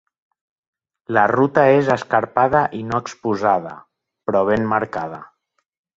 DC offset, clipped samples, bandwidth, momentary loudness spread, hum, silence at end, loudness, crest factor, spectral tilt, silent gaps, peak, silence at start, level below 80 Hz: under 0.1%; under 0.1%; 7.8 kHz; 13 LU; none; 0.7 s; -18 LUFS; 20 dB; -7 dB/octave; none; 0 dBFS; 1.1 s; -54 dBFS